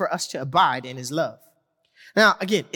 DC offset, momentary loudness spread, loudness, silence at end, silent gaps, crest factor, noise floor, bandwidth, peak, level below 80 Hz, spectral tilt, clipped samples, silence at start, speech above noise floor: under 0.1%; 11 LU; -22 LUFS; 0.1 s; none; 18 dB; -65 dBFS; 17.5 kHz; -4 dBFS; -70 dBFS; -3.5 dB/octave; under 0.1%; 0 s; 43 dB